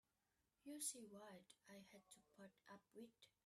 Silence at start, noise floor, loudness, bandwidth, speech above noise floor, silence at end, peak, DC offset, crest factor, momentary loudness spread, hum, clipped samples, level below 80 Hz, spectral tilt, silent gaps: 0.65 s; -90 dBFS; -57 LUFS; 13.5 kHz; 29 dB; 0.2 s; -36 dBFS; under 0.1%; 26 dB; 17 LU; none; under 0.1%; under -90 dBFS; -2 dB/octave; none